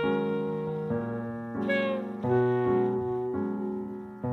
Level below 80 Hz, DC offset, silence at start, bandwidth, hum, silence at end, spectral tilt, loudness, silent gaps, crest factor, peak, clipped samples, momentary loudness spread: -62 dBFS; under 0.1%; 0 s; 4.6 kHz; none; 0 s; -9 dB/octave; -30 LUFS; none; 16 dB; -14 dBFS; under 0.1%; 9 LU